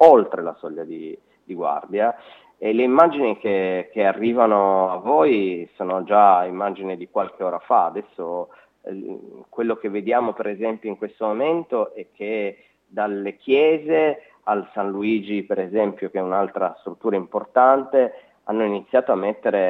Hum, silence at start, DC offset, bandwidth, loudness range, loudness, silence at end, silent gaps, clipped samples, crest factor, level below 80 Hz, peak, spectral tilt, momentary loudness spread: none; 0 s; under 0.1%; 5.6 kHz; 7 LU; -21 LUFS; 0 s; none; under 0.1%; 20 dB; -72 dBFS; 0 dBFS; -8 dB/octave; 16 LU